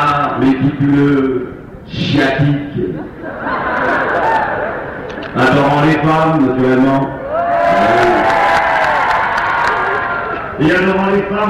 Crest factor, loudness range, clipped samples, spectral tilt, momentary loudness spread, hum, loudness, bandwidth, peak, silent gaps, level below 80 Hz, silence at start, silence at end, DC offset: 10 dB; 4 LU; under 0.1%; -7 dB/octave; 10 LU; none; -13 LUFS; 12 kHz; -2 dBFS; none; -40 dBFS; 0 s; 0 s; under 0.1%